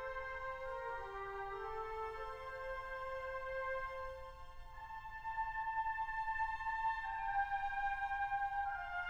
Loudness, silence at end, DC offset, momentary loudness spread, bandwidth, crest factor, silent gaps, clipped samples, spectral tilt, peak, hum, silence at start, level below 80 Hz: -42 LUFS; 0 s; under 0.1%; 9 LU; 16 kHz; 16 dB; none; under 0.1%; -4 dB/octave; -26 dBFS; none; 0 s; -56 dBFS